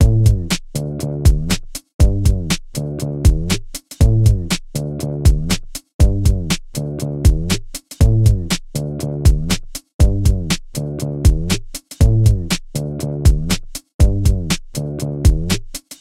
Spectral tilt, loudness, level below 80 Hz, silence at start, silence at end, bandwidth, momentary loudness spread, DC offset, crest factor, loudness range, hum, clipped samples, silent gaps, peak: -5.5 dB/octave; -18 LUFS; -18 dBFS; 0 s; 0.05 s; 16 kHz; 9 LU; under 0.1%; 16 dB; 1 LU; none; under 0.1%; 1.94-1.99 s, 5.94-5.99 s, 9.94-9.99 s, 13.94-13.99 s; 0 dBFS